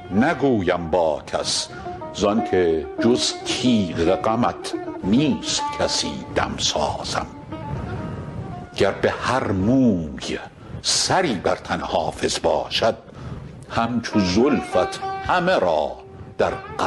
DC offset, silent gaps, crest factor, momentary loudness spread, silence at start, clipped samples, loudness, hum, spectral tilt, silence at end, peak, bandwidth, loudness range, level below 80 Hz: under 0.1%; none; 16 dB; 13 LU; 0 s; under 0.1%; -21 LUFS; none; -4.5 dB/octave; 0 s; -6 dBFS; 12 kHz; 3 LU; -42 dBFS